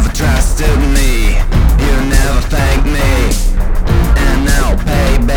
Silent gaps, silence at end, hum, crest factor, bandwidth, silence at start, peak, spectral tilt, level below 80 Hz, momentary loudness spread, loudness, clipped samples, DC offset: none; 0 s; none; 10 dB; 18 kHz; 0 s; 0 dBFS; -5 dB/octave; -10 dBFS; 3 LU; -13 LUFS; under 0.1%; under 0.1%